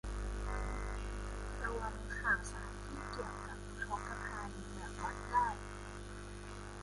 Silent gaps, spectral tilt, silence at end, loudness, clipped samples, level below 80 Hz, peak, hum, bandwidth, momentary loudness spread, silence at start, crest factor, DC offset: none; -4.5 dB/octave; 0 s; -42 LUFS; under 0.1%; -46 dBFS; -22 dBFS; 50 Hz at -45 dBFS; 11.5 kHz; 13 LU; 0.05 s; 20 dB; under 0.1%